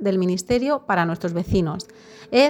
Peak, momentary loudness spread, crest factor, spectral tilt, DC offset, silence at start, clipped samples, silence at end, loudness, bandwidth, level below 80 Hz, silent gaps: -4 dBFS; 7 LU; 16 dB; -6 dB/octave; under 0.1%; 0 s; under 0.1%; 0 s; -22 LUFS; 18.5 kHz; -44 dBFS; none